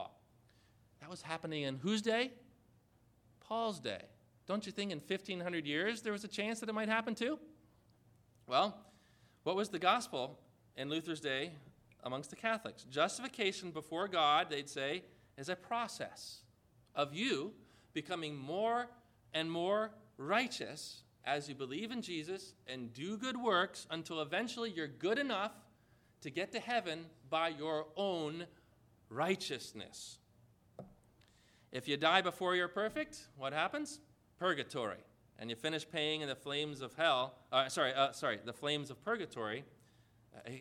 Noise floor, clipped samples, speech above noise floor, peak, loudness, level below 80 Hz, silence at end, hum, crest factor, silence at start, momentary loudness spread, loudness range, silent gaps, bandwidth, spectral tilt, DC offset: -70 dBFS; under 0.1%; 32 dB; -14 dBFS; -38 LUFS; -78 dBFS; 0 s; none; 26 dB; 0 s; 14 LU; 5 LU; none; 16.5 kHz; -4 dB/octave; under 0.1%